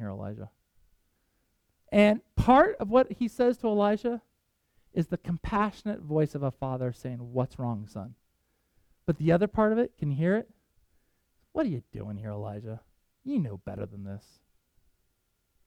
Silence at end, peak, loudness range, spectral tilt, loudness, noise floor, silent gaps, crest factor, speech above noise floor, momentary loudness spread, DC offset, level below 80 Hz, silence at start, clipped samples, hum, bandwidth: 1.45 s; -8 dBFS; 11 LU; -8 dB/octave; -28 LUFS; -75 dBFS; none; 20 dB; 47 dB; 18 LU; under 0.1%; -50 dBFS; 0 s; under 0.1%; none; 13 kHz